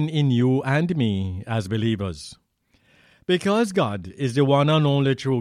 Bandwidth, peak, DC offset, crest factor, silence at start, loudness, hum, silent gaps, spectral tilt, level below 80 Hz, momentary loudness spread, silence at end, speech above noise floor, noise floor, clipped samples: 11.5 kHz; -8 dBFS; under 0.1%; 14 dB; 0 s; -22 LUFS; none; none; -7 dB/octave; -54 dBFS; 9 LU; 0 s; 43 dB; -64 dBFS; under 0.1%